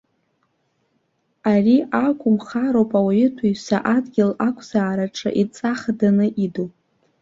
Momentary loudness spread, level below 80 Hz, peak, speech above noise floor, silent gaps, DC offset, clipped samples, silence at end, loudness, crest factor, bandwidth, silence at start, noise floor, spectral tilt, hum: 7 LU; -60 dBFS; -4 dBFS; 49 dB; none; under 0.1%; under 0.1%; 0.5 s; -20 LUFS; 16 dB; 7.6 kHz; 1.45 s; -68 dBFS; -7 dB/octave; none